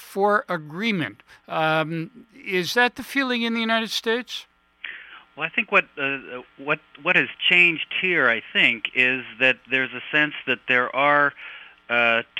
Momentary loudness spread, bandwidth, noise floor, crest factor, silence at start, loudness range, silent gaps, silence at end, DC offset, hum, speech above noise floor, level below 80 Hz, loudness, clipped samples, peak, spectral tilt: 16 LU; 16.5 kHz; -41 dBFS; 20 dB; 0 s; 5 LU; none; 0 s; under 0.1%; none; 18 dB; -70 dBFS; -21 LUFS; under 0.1%; -2 dBFS; -4 dB/octave